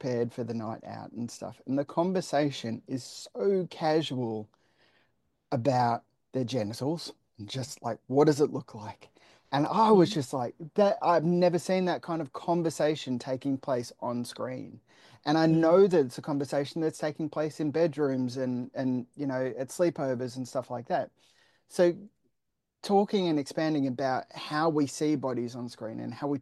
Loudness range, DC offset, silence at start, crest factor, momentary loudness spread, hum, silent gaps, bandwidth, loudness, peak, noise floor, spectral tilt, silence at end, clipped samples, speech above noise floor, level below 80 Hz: 6 LU; under 0.1%; 0 s; 20 dB; 14 LU; none; none; 12.5 kHz; -29 LUFS; -10 dBFS; -83 dBFS; -6.5 dB/octave; 0 s; under 0.1%; 54 dB; -76 dBFS